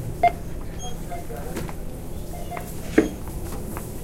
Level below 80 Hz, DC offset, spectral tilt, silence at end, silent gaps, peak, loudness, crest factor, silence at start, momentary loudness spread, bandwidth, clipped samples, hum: -36 dBFS; under 0.1%; -6 dB/octave; 0 s; none; -2 dBFS; -29 LUFS; 26 dB; 0 s; 13 LU; 16.5 kHz; under 0.1%; none